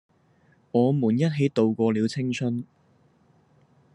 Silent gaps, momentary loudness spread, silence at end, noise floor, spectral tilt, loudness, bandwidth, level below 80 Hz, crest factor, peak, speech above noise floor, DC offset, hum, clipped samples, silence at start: none; 7 LU; 1.3 s; -61 dBFS; -7.5 dB/octave; -24 LUFS; 10.5 kHz; -72 dBFS; 18 dB; -8 dBFS; 38 dB; under 0.1%; none; under 0.1%; 0.75 s